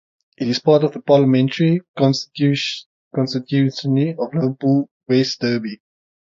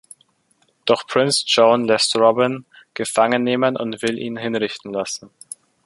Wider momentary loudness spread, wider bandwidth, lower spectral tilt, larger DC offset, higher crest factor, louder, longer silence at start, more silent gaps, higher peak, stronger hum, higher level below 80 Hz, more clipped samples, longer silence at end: second, 9 LU vs 17 LU; second, 7.6 kHz vs 11.5 kHz; first, -6.5 dB/octave vs -3.5 dB/octave; neither; about the same, 16 dB vs 18 dB; about the same, -18 LUFS vs -19 LUFS; second, 0.4 s vs 0.85 s; first, 1.88-1.94 s, 2.86-3.11 s, 4.91-5.00 s vs none; about the same, -2 dBFS vs 0 dBFS; neither; about the same, -64 dBFS vs -64 dBFS; neither; about the same, 0.55 s vs 0.6 s